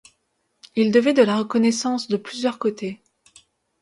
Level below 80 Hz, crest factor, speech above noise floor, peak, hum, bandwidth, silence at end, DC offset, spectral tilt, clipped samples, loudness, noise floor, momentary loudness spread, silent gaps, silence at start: -68 dBFS; 18 dB; 51 dB; -4 dBFS; none; 11.5 kHz; 0.85 s; under 0.1%; -5 dB/octave; under 0.1%; -21 LUFS; -71 dBFS; 14 LU; none; 0.75 s